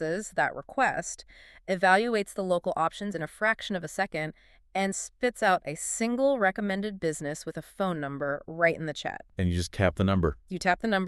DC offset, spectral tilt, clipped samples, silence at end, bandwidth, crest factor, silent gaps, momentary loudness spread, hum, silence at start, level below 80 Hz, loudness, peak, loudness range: under 0.1%; -4.5 dB/octave; under 0.1%; 0 s; 13.5 kHz; 22 dB; none; 10 LU; none; 0 s; -50 dBFS; -29 LUFS; -8 dBFS; 2 LU